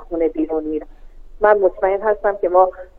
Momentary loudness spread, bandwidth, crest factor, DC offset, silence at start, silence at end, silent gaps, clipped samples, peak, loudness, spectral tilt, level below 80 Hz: 8 LU; 3.9 kHz; 18 dB; under 0.1%; 0 s; 0.15 s; none; under 0.1%; 0 dBFS; -18 LUFS; -8.5 dB/octave; -40 dBFS